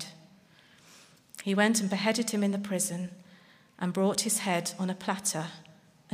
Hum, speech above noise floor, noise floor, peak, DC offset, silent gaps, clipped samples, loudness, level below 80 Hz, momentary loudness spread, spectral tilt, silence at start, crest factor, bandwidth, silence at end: none; 30 dB; -59 dBFS; -12 dBFS; under 0.1%; none; under 0.1%; -29 LUFS; -76 dBFS; 15 LU; -3.5 dB/octave; 0 s; 20 dB; 15.5 kHz; 0 s